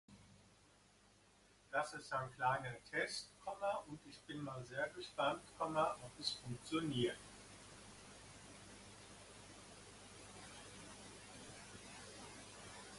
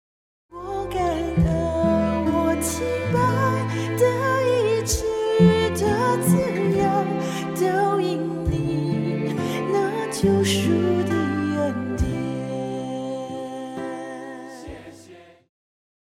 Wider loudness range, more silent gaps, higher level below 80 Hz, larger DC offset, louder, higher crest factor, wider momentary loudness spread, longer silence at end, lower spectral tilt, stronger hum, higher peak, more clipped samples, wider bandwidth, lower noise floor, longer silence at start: first, 14 LU vs 9 LU; neither; second, -72 dBFS vs -40 dBFS; neither; second, -44 LUFS vs -22 LUFS; about the same, 22 dB vs 18 dB; first, 18 LU vs 12 LU; second, 0 s vs 0.8 s; second, -4 dB/octave vs -6 dB/octave; first, 50 Hz at -70 dBFS vs none; second, -24 dBFS vs -4 dBFS; neither; second, 11.5 kHz vs 16 kHz; first, -70 dBFS vs -47 dBFS; second, 0.1 s vs 0.5 s